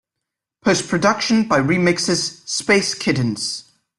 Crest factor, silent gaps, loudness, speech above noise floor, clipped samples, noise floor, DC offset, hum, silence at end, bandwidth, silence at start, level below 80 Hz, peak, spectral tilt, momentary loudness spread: 18 dB; none; -18 LUFS; 64 dB; under 0.1%; -82 dBFS; under 0.1%; none; 0.35 s; 12 kHz; 0.65 s; -54 dBFS; -2 dBFS; -4 dB/octave; 7 LU